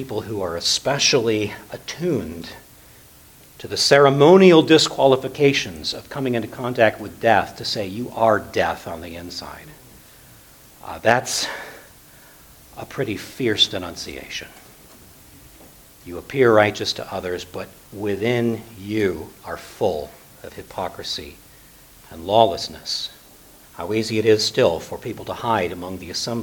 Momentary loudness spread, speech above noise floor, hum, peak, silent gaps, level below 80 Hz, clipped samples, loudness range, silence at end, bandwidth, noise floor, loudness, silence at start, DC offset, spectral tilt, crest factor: 19 LU; 27 dB; none; 0 dBFS; none; -52 dBFS; under 0.1%; 10 LU; 0 s; 19 kHz; -48 dBFS; -20 LUFS; 0 s; under 0.1%; -4 dB/octave; 22 dB